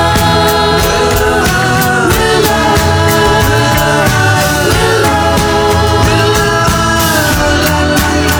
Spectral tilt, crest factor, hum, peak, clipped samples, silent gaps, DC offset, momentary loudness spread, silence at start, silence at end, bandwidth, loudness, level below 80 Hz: -4 dB/octave; 10 dB; none; 0 dBFS; under 0.1%; none; under 0.1%; 1 LU; 0 s; 0 s; over 20 kHz; -9 LUFS; -22 dBFS